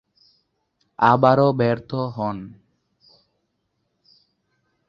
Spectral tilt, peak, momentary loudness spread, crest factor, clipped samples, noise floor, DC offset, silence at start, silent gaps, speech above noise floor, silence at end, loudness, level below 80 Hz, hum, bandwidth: -9 dB/octave; -2 dBFS; 15 LU; 22 dB; under 0.1%; -73 dBFS; under 0.1%; 1 s; none; 54 dB; 2.4 s; -19 LUFS; -60 dBFS; none; 7 kHz